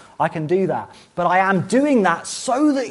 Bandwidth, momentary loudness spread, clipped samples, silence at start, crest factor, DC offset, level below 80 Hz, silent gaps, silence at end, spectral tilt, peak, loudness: 11.5 kHz; 7 LU; under 0.1%; 0.2 s; 16 dB; under 0.1%; -62 dBFS; none; 0 s; -5.5 dB/octave; -4 dBFS; -19 LUFS